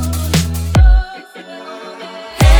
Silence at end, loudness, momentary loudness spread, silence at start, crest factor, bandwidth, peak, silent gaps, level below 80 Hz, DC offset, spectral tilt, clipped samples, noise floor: 0 s; -14 LUFS; 20 LU; 0 s; 12 dB; 20 kHz; 0 dBFS; none; -16 dBFS; under 0.1%; -5 dB/octave; under 0.1%; -32 dBFS